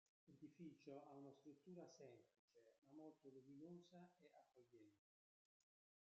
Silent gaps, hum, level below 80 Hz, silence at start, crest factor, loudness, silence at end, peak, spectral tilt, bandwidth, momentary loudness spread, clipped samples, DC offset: 2.39-2.48 s, 2.78-2.82 s; none; under -90 dBFS; 0.25 s; 18 dB; -64 LUFS; 1.05 s; -48 dBFS; -7 dB/octave; 7.4 kHz; 6 LU; under 0.1%; under 0.1%